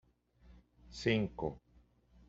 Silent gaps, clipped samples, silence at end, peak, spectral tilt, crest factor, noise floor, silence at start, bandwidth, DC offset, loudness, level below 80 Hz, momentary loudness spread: none; under 0.1%; 0.7 s; -18 dBFS; -5 dB/octave; 22 dB; -67 dBFS; 0.45 s; 8 kHz; under 0.1%; -36 LUFS; -60 dBFS; 20 LU